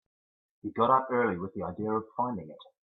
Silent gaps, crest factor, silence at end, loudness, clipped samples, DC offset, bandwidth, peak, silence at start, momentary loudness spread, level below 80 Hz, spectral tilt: none; 20 dB; 0.25 s; -30 LUFS; under 0.1%; under 0.1%; 4.1 kHz; -10 dBFS; 0.65 s; 15 LU; -70 dBFS; -10 dB/octave